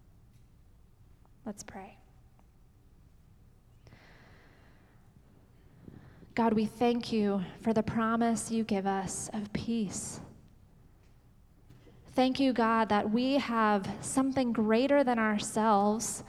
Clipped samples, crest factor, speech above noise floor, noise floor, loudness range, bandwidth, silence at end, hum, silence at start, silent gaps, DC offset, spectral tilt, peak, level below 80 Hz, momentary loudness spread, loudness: under 0.1%; 18 dB; 30 dB; -60 dBFS; 23 LU; 13.5 kHz; 0 s; none; 1.45 s; none; under 0.1%; -4.5 dB/octave; -14 dBFS; -60 dBFS; 12 LU; -30 LUFS